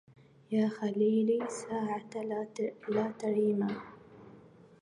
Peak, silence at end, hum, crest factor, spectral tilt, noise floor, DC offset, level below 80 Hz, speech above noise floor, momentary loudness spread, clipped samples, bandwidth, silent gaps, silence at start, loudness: -18 dBFS; 0.4 s; none; 16 dB; -6.5 dB/octave; -56 dBFS; under 0.1%; -76 dBFS; 25 dB; 9 LU; under 0.1%; 11 kHz; none; 0.5 s; -33 LUFS